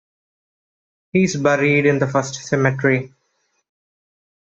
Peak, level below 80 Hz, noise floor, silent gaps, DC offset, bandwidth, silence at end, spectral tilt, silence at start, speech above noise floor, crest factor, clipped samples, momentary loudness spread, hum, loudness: -2 dBFS; -60 dBFS; -68 dBFS; none; under 0.1%; 8 kHz; 1.5 s; -6 dB/octave; 1.15 s; 51 dB; 18 dB; under 0.1%; 7 LU; none; -18 LUFS